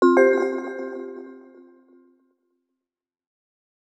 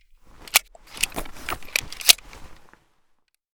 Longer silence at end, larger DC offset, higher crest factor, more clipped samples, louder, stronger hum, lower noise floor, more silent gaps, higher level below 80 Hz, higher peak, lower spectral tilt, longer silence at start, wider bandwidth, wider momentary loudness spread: first, 2.45 s vs 1 s; neither; second, 20 dB vs 28 dB; neither; about the same, -22 LUFS vs -21 LUFS; neither; first, -83 dBFS vs -65 dBFS; neither; second, under -90 dBFS vs -46 dBFS; second, -6 dBFS vs 0 dBFS; first, -4.5 dB/octave vs 1 dB/octave; second, 0 s vs 0.4 s; second, 8.4 kHz vs over 20 kHz; first, 23 LU vs 16 LU